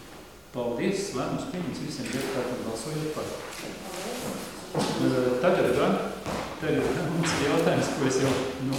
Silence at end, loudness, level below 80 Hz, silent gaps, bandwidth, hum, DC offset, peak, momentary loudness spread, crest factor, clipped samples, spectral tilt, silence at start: 0 s; -28 LUFS; -54 dBFS; none; 18 kHz; none; 0.1%; -10 dBFS; 12 LU; 18 dB; under 0.1%; -5 dB/octave; 0 s